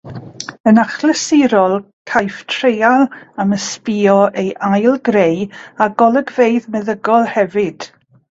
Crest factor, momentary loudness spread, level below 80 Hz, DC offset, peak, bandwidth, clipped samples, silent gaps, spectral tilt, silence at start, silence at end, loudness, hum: 14 dB; 10 LU; -58 dBFS; under 0.1%; 0 dBFS; 8 kHz; under 0.1%; 0.60-0.64 s, 1.93-2.05 s; -5 dB/octave; 0.05 s; 0.5 s; -14 LUFS; none